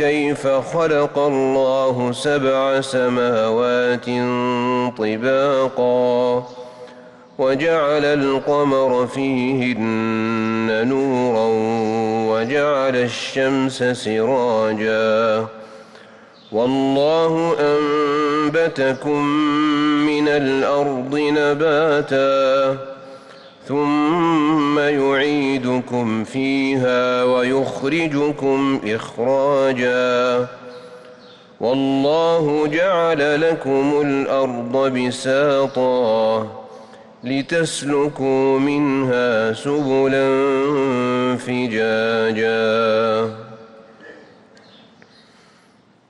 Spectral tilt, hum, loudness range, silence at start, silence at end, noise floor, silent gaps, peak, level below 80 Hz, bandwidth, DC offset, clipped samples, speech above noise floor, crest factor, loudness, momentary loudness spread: -5.5 dB/octave; none; 2 LU; 0 s; 1.95 s; -53 dBFS; none; -8 dBFS; -58 dBFS; 11.5 kHz; under 0.1%; under 0.1%; 36 dB; 10 dB; -18 LUFS; 5 LU